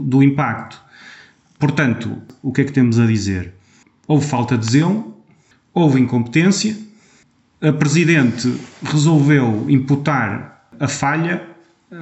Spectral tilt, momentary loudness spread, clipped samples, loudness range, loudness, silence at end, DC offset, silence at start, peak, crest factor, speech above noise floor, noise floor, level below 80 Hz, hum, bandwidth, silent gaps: -6 dB/octave; 12 LU; under 0.1%; 3 LU; -17 LUFS; 0 s; under 0.1%; 0 s; -2 dBFS; 16 dB; 39 dB; -55 dBFS; -54 dBFS; none; 8.4 kHz; none